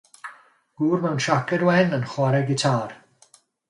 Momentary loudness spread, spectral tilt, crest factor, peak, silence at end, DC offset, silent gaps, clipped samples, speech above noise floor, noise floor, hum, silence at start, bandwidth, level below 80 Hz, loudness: 19 LU; -6 dB/octave; 18 dB; -4 dBFS; 0.75 s; under 0.1%; none; under 0.1%; 36 dB; -57 dBFS; none; 0.25 s; 11.5 kHz; -64 dBFS; -22 LUFS